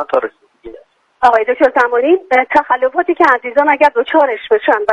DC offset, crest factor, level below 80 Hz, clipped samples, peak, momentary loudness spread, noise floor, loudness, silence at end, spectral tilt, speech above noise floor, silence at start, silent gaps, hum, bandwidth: under 0.1%; 12 dB; -54 dBFS; under 0.1%; 0 dBFS; 4 LU; -41 dBFS; -12 LUFS; 0 s; -4.5 dB/octave; 29 dB; 0 s; none; none; 10 kHz